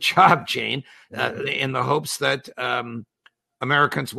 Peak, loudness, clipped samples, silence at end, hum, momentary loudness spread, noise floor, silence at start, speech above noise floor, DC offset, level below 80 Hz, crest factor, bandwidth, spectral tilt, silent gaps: -2 dBFS; -22 LUFS; under 0.1%; 0 s; none; 15 LU; -61 dBFS; 0 s; 38 dB; under 0.1%; -66 dBFS; 22 dB; 13.5 kHz; -4 dB/octave; none